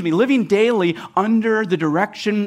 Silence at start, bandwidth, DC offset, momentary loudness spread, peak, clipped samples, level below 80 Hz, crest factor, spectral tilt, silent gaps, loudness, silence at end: 0 s; 11 kHz; under 0.1%; 4 LU; -4 dBFS; under 0.1%; -66 dBFS; 12 dB; -6.5 dB/octave; none; -18 LUFS; 0 s